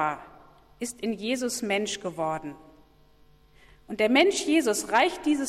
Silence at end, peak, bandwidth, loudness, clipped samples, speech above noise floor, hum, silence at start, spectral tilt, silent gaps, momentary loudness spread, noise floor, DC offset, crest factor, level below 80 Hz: 0 s; -10 dBFS; 15.5 kHz; -26 LUFS; under 0.1%; 31 dB; none; 0 s; -3 dB/octave; none; 15 LU; -57 dBFS; under 0.1%; 18 dB; -62 dBFS